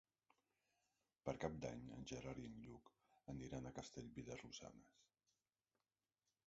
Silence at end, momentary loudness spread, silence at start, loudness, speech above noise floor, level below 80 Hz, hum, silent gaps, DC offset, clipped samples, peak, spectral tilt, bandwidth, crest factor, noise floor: 1.45 s; 14 LU; 1.25 s; -53 LUFS; over 37 dB; -72 dBFS; none; none; under 0.1%; under 0.1%; -30 dBFS; -5.5 dB/octave; 7.6 kHz; 26 dB; under -90 dBFS